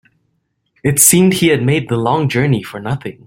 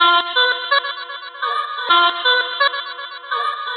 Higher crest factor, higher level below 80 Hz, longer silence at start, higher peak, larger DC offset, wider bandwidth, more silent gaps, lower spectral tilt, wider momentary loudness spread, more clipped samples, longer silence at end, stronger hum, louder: about the same, 14 dB vs 16 dB; first, -48 dBFS vs under -90 dBFS; first, 0.85 s vs 0 s; about the same, 0 dBFS vs -2 dBFS; neither; first, 16.5 kHz vs 10 kHz; neither; first, -4.5 dB/octave vs -0.5 dB/octave; about the same, 14 LU vs 14 LU; neither; first, 0.15 s vs 0 s; neither; first, -13 LUFS vs -17 LUFS